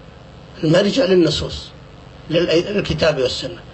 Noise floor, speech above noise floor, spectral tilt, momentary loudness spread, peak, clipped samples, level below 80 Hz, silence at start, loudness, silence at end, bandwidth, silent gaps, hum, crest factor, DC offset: -40 dBFS; 23 dB; -5.5 dB/octave; 12 LU; -4 dBFS; under 0.1%; -40 dBFS; 0 s; -17 LUFS; 0 s; 8.4 kHz; none; none; 16 dB; under 0.1%